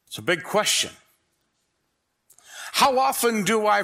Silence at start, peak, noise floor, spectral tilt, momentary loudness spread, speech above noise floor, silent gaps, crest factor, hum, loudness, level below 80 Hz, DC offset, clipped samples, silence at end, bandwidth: 0.1 s; -6 dBFS; -74 dBFS; -2 dB/octave; 8 LU; 53 dB; none; 18 dB; none; -22 LUFS; -66 dBFS; under 0.1%; under 0.1%; 0 s; 16 kHz